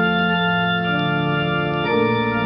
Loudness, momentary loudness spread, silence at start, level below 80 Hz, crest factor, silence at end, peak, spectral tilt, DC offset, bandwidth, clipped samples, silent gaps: -19 LUFS; 2 LU; 0 s; -48 dBFS; 12 dB; 0 s; -6 dBFS; -4 dB/octave; under 0.1%; 5.8 kHz; under 0.1%; none